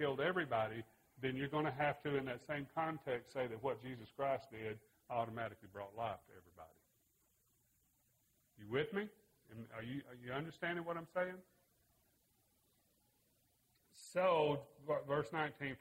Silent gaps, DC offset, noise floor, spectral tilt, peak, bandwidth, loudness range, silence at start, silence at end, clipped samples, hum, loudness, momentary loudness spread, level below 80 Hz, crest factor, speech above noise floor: none; under 0.1%; -78 dBFS; -6.5 dB/octave; -22 dBFS; 16 kHz; 8 LU; 0 s; 0.05 s; under 0.1%; none; -42 LUFS; 15 LU; -76 dBFS; 20 dB; 37 dB